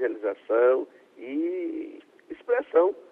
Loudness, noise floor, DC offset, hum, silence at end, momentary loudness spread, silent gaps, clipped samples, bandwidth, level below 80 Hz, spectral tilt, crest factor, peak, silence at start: -26 LUFS; -45 dBFS; under 0.1%; none; 0.1 s; 20 LU; none; under 0.1%; 3.7 kHz; -76 dBFS; -6.5 dB/octave; 18 dB; -8 dBFS; 0 s